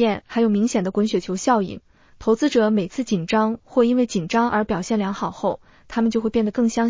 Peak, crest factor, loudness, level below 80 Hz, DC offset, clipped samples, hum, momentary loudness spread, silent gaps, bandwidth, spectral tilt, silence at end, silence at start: -6 dBFS; 14 dB; -21 LUFS; -52 dBFS; under 0.1%; under 0.1%; none; 7 LU; none; 7.6 kHz; -5.5 dB/octave; 0 s; 0 s